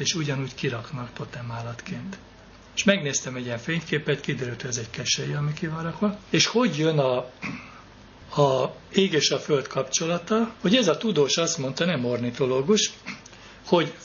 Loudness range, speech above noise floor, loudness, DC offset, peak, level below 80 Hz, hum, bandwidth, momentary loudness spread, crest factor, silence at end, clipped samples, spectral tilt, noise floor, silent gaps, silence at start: 5 LU; 22 dB; -25 LUFS; under 0.1%; -2 dBFS; -58 dBFS; none; 7.2 kHz; 14 LU; 24 dB; 0 s; under 0.1%; -4 dB/octave; -47 dBFS; none; 0 s